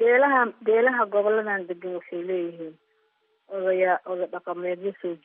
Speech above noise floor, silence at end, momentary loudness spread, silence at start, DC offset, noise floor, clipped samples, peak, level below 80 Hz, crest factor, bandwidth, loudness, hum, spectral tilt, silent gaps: 44 dB; 0.1 s; 13 LU; 0 s; under 0.1%; -69 dBFS; under 0.1%; -10 dBFS; under -90 dBFS; 16 dB; 3.8 kHz; -25 LUFS; none; -3.5 dB/octave; none